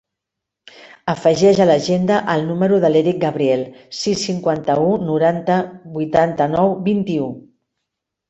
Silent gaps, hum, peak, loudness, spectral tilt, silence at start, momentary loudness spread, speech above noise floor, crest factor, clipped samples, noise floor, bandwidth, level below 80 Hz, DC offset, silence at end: none; none; -2 dBFS; -17 LUFS; -6 dB/octave; 0.85 s; 10 LU; 65 dB; 16 dB; under 0.1%; -82 dBFS; 8.4 kHz; -56 dBFS; under 0.1%; 0.9 s